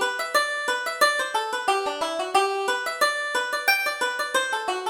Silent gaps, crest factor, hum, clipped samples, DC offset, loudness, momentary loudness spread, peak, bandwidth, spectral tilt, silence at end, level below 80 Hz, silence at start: none; 18 dB; none; under 0.1%; under 0.1%; -23 LUFS; 5 LU; -6 dBFS; over 20 kHz; 0.5 dB/octave; 0 s; -68 dBFS; 0 s